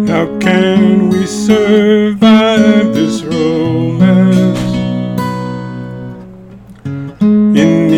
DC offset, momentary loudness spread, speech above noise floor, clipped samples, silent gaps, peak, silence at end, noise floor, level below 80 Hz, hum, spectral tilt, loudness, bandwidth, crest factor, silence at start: under 0.1%; 16 LU; 24 dB; 0.4%; none; 0 dBFS; 0 s; -34 dBFS; -42 dBFS; none; -6.5 dB/octave; -10 LUFS; 11.5 kHz; 10 dB; 0 s